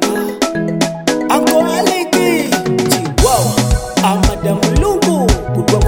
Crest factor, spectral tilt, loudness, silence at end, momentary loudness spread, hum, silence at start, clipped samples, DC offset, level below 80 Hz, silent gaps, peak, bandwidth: 12 dB; -4.5 dB/octave; -14 LUFS; 0 s; 5 LU; none; 0 s; under 0.1%; 0.2%; -22 dBFS; none; 0 dBFS; 17 kHz